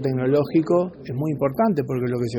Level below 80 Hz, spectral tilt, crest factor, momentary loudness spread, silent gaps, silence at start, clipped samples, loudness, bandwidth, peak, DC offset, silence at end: -56 dBFS; -9 dB/octave; 14 dB; 7 LU; none; 0 s; under 0.1%; -22 LUFS; 18.5 kHz; -8 dBFS; under 0.1%; 0 s